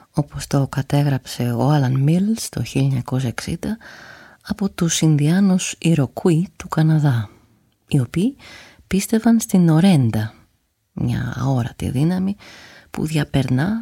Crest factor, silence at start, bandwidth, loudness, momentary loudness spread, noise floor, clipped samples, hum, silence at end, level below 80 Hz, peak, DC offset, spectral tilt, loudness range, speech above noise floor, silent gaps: 14 dB; 0.15 s; 16.5 kHz; -19 LUFS; 11 LU; -65 dBFS; under 0.1%; none; 0 s; -46 dBFS; -4 dBFS; under 0.1%; -6 dB/octave; 3 LU; 47 dB; none